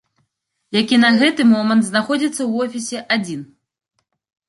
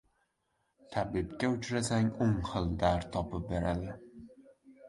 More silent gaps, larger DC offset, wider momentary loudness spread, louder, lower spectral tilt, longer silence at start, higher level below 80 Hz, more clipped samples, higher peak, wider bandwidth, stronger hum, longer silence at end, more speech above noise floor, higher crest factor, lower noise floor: neither; neither; about the same, 10 LU vs 11 LU; first, -16 LUFS vs -33 LUFS; second, -4 dB/octave vs -6 dB/octave; second, 0.7 s vs 0.9 s; second, -66 dBFS vs -48 dBFS; neither; first, -2 dBFS vs -14 dBFS; about the same, 11.5 kHz vs 11.5 kHz; neither; first, 1.05 s vs 0 s; first, 56 dB vs 47 dB; about the same, 16 dB vs 20 dB; second, -72 dBFS vs -79 dBFS